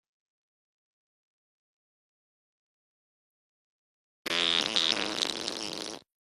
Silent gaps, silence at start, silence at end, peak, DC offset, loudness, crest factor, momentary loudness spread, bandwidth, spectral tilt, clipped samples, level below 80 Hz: none; 4.25 s; 0.2 s; -6 dBFS; under 0.1%; -28 LUFS; 30 dB; 13 LU; 13.5 kHz; -1 dB/octave; under 0.1%; -74 dBFS